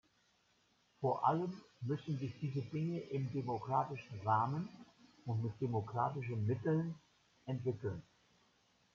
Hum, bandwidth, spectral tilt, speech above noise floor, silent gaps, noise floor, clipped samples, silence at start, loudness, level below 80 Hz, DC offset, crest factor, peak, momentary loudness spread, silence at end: none; 7.2 kHz; -9 dB/octave; 37 dB; none; -75 dBFS; under 0.1%; 1 s; -39 LUFS; -76 dBFS; under 0.1%; 22 dB; -18 dBFS; 10 LU; 0.95 s